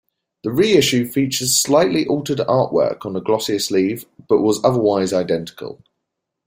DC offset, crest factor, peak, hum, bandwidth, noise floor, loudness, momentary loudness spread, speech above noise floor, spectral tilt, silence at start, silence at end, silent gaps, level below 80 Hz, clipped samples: under 0.1%; 16 dB; -2 dBFS; none; 16 kHz; -78 dBFS; -17 LUFS; 10 LU; 61 dB; -4 dB/octave; 0.45 s; 0.7 s; none; -56 dBFS; under 0.1%